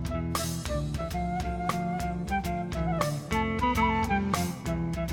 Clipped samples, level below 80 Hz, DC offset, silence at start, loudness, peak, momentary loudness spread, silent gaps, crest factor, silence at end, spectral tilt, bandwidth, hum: under 0.1%; -38 dBFS; under 0.1%; 0 s; -30 LUFS; -10 dBFS; 6 LU; none; 20 dB; 0 s; -5.5 dB/octave; 18 kHz; none